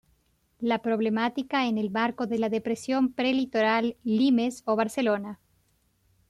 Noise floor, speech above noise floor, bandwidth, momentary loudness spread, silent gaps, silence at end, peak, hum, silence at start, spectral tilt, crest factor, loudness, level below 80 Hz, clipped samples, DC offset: -68 dBFS; 43 dB; 13 kHz; 5 LU; none; 0.95 s; -14 dBFS; none; 0.6 s; -5.5 dB/octave; 14 dB; -26 LUFS; -68 dBFS; under 0.1%; under 0.1%